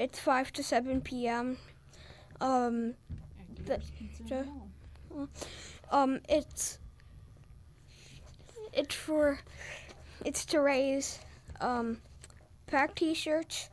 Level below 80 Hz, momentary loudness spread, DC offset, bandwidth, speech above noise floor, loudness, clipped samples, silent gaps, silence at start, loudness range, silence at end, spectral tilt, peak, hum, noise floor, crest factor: -54 dBFS; 22 LU; under 0.1%; 11 kHz; 23 dB; -33 LUFS; under 0.1%; none; 0 s; 4 LU; 0.05 s; -3.5 dB/octave; -16 dBFS; none; -56 dBFS; 18 dB